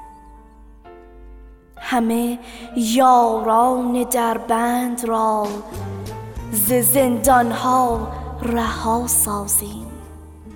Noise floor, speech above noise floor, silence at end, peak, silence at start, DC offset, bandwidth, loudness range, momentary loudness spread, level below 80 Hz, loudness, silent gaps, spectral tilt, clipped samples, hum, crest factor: -44 dBFS; 26 dB; 0 s; -4 dBFS; 0 s; under 0.1%; 19.5 kHz; 3 LU; 16 LU; -40 dBFS; -18 LUFS; none; -4 dB/octave; under 0.1%; none; 16 dB